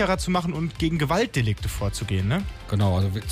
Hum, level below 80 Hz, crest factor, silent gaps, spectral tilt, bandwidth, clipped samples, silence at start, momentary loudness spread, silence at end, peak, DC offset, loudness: none; -38 dBFS; 12 dB; none; -6 dB/octave; 15.5 kHz; under 0.1%; 0 s; 6 LU; 0 s; -12 dBFS; under 0.1%; -25 LUFS